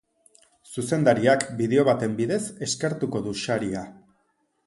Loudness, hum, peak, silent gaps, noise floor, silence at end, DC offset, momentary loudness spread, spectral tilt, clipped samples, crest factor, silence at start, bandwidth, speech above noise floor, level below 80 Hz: -24 LUFS; none; -6 dBFS; none; -70 dBFS; 0.75 s; under 0.1%; 12 LU; -5 dB/octave; under 0.1%; 20 dB; 0.7 s; 11.5 kHz; 47 dB; -60 dBFS